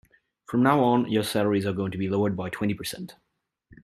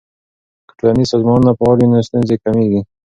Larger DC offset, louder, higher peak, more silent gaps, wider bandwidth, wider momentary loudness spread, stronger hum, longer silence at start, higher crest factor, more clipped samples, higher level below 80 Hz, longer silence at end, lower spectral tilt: neither; second, -25 LUFS vs -13 LUFS; second, -6 dBFS vs 0 dBFS; neither; first, 14.5 kHz vs 7.8 kHz; first, 12 LU vs 5 LU; neither; second, 0.5 s vs 0.85 s; first, 20 dB vs 14 dB; neither; second, -62 dBFS vs -42 dBFS; about the same, 0.1 s vs 0.2 s; second, -6 dB/octave vs -8 dB/octave